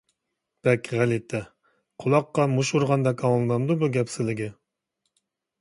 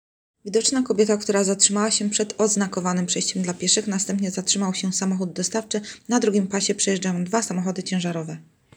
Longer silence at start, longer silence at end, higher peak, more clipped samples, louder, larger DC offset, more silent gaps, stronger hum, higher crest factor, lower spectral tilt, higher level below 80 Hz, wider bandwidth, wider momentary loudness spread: first, 0.65 s vs 0.45 s; first, 1.1 s vs 0.35 s; second, -8 dBFS vs -2 dBFS; neither; about the same, -24 LUFS vs -22 LUFS; neither; neither; neither; about the same, 18 dB vs 20 dB; first, -6.5 dB/octave vs -3.5 dB/octave; about the same, -64 dBFS vs -68 dBFS; second, 11.5 kHz vs 19.5 kHz; first, 9 LU vs 6 LU